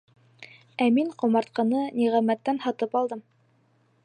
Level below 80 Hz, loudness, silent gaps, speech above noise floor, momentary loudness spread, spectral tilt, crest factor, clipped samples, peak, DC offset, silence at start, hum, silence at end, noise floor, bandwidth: -82 dBFS; -25 LUFS; none; 41 dB; 6 LU; -6.5 dB/octave; 16 dB; under 0.1%; -10 dBFS; under 0.1%; 0.4 s; none; 0.85 s; -65 dBFS; 9.4 kHz